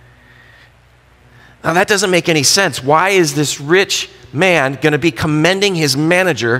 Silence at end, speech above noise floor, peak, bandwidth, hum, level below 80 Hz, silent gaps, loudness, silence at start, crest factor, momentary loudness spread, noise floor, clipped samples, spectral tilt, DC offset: 0 s; 35 dB; 0 dBFS; 16.5 kHz; none; -50 dBFS; none; -13 LUFS; 1.65 s; 14 dB; 6 LU; -48 dBFS; under 0.1%; -3.5 dB/octave; under 0.1%